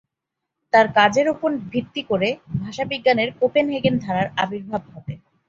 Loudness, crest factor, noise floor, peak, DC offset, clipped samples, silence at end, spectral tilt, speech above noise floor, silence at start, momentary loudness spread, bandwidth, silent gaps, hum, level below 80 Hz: -21 LUFS; 20 dB; -82 dBFS; -2 dBFS; under 0.1%; under 0.1%; 0.3 s; -5.5 dB/octave; 62 dB; 0.75 s; 13 LU; 7.8 kHz; none; none; -56 dBFS